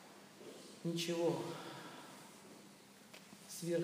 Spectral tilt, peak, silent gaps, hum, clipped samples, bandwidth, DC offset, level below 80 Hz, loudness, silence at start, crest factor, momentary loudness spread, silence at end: -5 dB/octave; -26 dBFS; none; none; under 0.1%; 15.5 kHz; under 0.1%; under -90 dBFS; -42 LUFS; 0 s; 18 dB; 20 LU; 0 s